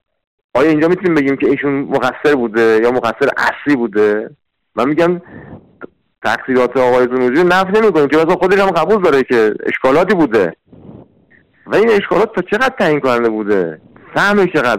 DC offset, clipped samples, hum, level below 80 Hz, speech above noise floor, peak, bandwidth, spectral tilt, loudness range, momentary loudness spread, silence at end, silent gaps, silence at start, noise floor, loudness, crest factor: under 0.1%; under 0.1%; none; -48 dBFS; 38 dB; -6 dBFS; 15 kHz; -6 dB/octave; 4 LU; 6 LU; 0 s; none; 0.55 s; -50 dBFS; -13 LUFS; 8 dB